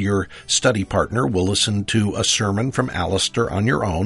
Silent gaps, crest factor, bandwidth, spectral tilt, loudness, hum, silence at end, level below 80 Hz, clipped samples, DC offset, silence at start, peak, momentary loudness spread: none; 16 dB; 11.5 kHz; -4 dB/octave; -20 LUFS; none; 0 s; -42 dBFS; under 0.1%; under 0.1%; 0 s; -2 dBFS; 4 LU